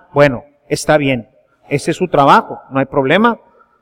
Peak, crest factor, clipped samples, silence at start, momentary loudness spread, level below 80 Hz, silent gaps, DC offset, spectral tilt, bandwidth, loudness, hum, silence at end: 0 dBFS; 14 dB; under 0.1%; 0.15 s; 12 LU; -44 dBFS; none; under 0.1%; -5.5 dB/octave; 16 kHz; -14 LUFS; none; 0.45 s